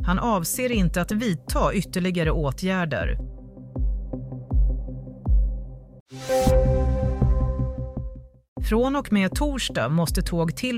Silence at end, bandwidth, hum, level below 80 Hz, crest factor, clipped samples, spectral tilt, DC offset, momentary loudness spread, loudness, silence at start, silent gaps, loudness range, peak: 0 s; 15.5 kHz; none; -28 dBFS; 16 dB; under 0.1%; -6 dB/octave; under 0.1%; 13 LU; -24 LUFS; 0 s; 6.00-6.06 s, 8.48-8.56 s; 4 LU; -8 dBFS